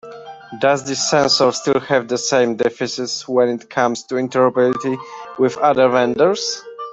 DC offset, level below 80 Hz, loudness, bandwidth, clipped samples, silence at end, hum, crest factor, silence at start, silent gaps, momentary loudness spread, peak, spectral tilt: under 0.1%; -60 dBFS; -17 LUFS; 8.4 kHz; under 0.1%; 0 s; none; 16 dB; 0.05 s; none; 10 LU; 0 dBFS; -3.5 dB/octave